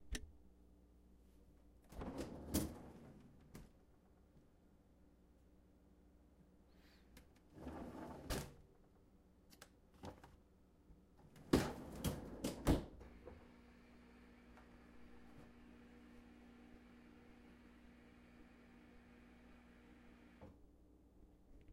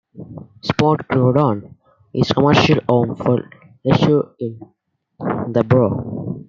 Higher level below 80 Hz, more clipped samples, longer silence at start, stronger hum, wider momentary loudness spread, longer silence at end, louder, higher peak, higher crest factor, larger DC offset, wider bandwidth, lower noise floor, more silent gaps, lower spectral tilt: second, -58 dBFS vs -48 dBFS; neither; second, 0 s vs 0.15 s; neither; first, 26 LU vs 14 LU; about the same, 0 s vs 0.05 s; second, -46 LUFS vs -17 LUFS; second, -18 dBFS vs 0 dBFS; first, 32 dB vs 18 dB; neither; first, 16 kHz vs 7.4 kHz; first, -70 dBFS vs -38 dBFS; neither; second, -5.5 dB/octave vs -7.5 dB/octave